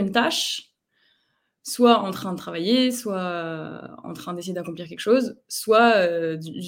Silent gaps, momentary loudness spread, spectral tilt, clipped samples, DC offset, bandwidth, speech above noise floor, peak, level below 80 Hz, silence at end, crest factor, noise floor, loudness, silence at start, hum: none; 16 LU; -4 dB/octave; under 0.1%; under 0.1%; 17 kHz; 49 dB; -4 dBFS; -70 dBFS; 0 s; 20 dB; -71 dBFS; -22 LUFS; 0 s; none